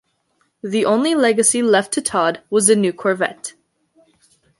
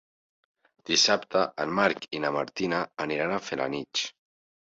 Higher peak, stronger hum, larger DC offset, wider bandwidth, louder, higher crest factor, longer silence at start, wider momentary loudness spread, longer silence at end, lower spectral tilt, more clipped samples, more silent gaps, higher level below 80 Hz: first, 0 dBFS vs -10 dBFS; neither; neither; first, 12 kHz vs 8 kHz; first, -17 LUFS vs -27 LUFS; about the same, 18 dB vs 20 dB; second, 0.65 s vs 0.85 s; about the same, 10 LU vs 9 LU; first, 1.1 s vs 0.6 s; about the same, -3 dB/octave vs -2.5 dB/octave; neither; neither; about the same, -64 dBFS vs -68 dBFS